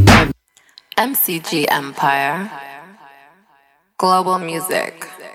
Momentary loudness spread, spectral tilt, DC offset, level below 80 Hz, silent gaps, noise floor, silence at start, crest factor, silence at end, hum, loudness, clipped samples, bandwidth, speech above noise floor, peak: 19 LU; -4.5 dB/octave; under 0.1%; -34 dBFS; none; -56 dBFS; 0 s; 18 dB; 0 s; none; -17 LUFS; under 0.1%; 17 kHz; 38 dB; 0 dBFS